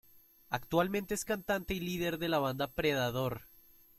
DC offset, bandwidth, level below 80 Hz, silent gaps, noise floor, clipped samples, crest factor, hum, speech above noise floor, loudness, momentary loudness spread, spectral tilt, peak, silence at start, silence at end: under 0.1%; 16.5 kHz; -56 dBFS; none; -59 dBFS; under 0.1%; 18 dB; none; 25 dB; -34 LUFS; 7 LU; -4.5 dB/octave; -16 dBFS; 0.15 s; 0.5 s